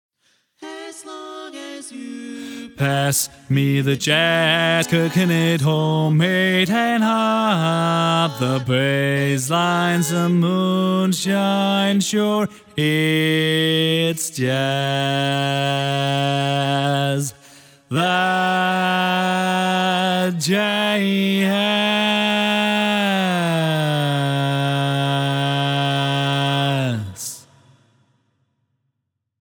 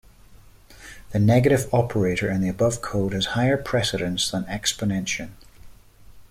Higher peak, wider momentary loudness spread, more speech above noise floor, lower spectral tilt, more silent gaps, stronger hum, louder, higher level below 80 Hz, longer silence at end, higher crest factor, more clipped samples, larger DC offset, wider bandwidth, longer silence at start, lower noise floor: about the same, -4 dBFS vs -6 dBFS; about the same, 9 LU vs 10 LU; first, 58 dB vs 26 dB; about the same, -5 dB/octave vs -5 dB/octave; neither; neither; first, -18 LUFS vs -23 LUFS; second, -64 dBFS vs -46 dBFS; first, 2.05 s vs 0.05 s; about the same, 16 dB vs 18 dB; neither; neither; first, 19.5 kHz vs 16 kHz; first, 0.6 s vs 0.3 s; first, -76 dBFS vs -49 dBFS